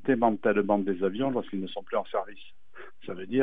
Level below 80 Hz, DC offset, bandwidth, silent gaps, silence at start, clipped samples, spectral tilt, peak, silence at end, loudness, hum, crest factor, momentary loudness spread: -70 dBFS; 0.9%; 4.8 kHz; none; 0.05 s; under 0.1%; -9.5 dB/octave; -10 dBFS; 0 s; -28 LUFS; none; 18 dB; 19 LU